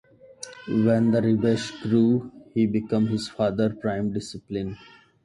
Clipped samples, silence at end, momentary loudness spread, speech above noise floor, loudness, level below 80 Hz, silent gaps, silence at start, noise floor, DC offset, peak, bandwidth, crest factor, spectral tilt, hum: under 0.1%; 0.5 s; 13 LU; 21 dB; -24 LUFS; -56 dBFS; none; 0.4 s; -44 dBFS; under 0.1%; -10 dBFS; 11.5 kHz; 14 dB; -7 dB/octave; none